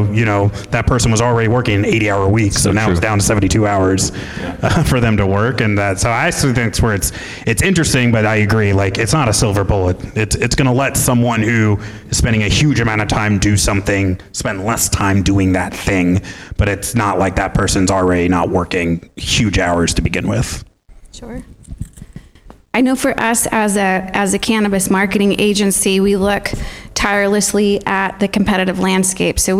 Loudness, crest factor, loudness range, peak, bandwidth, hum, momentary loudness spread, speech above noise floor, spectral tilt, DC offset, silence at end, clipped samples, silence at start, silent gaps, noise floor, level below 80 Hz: -15 LUFS; 10 dB; 4 LU; -4 dBFS; 16 kHz; none; 6 LU; 27 dB; -4.5 dB/octave; 0.2%; 0 s; under 0.1%; 0 s; none; -42 dBFS; -30 dBFS